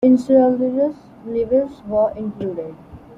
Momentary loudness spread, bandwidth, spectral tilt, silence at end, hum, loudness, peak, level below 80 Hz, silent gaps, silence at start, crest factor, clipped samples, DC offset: 15 LU; 7.6 kHz; -9 dB/octave; 0.05 s; none; -19 LUFS; -2 dBFS; -52 dBFS; none; 0 s; 16 dB; under 0.1%; under 0.1%